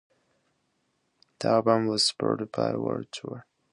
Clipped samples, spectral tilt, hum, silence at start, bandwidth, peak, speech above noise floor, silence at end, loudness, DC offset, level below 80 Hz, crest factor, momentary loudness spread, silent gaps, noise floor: under 0.1%; -4.5 dB/octave; none; 1.4 s; 11.5 kHz; -8 dBFS; 48 dB; 0.3 s; -26 LUFS; under 0.1%; -68 dBFS; 22 dB; 15 LU; none; -74 dBFS